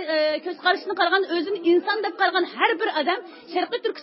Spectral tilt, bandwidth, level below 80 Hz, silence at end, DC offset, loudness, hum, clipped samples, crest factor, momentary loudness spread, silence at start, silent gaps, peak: -7 dB/octave; 5.8 kHz; -84 dBFS; 0 s; under 0.1%; -23 LUFS; none; under 0.1%; 18 dB; 6 LU; 0 s; none; -4 dBFS